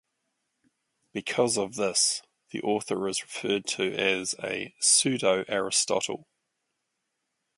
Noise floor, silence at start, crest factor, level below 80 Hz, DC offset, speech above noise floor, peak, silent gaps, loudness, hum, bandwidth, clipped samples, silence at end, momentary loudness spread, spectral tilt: -81 dBFS; 1.15 s; 22 dB; -72 dBFS; under 0.1%; 53 dB; -8 dBFS; none; -26 LUFS; none; 11.5 kHz; under 0.1%; 1.4 s; 13 LU; -2 dB/octave